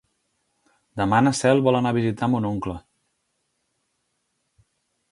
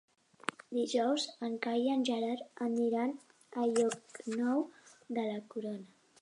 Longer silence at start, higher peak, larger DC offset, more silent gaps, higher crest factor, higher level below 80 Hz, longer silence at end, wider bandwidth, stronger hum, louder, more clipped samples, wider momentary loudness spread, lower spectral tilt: first, 0.95 s vs 0.7 s; first, -4 dBFS vs -12 dBFS; neither; neither; about the same, 20 dB vs 24 dB; first, -54 dBFS vs -88 dBFS; first, 2.3 s vs 0.35 s; about the same, 11.5 kHz vs 11 kHz; neither; first, -21 LUFS vs -35 LUFS; neither; first, 14 LU vs 11 LU; first, -6 dB/octave vs -4 dB/octave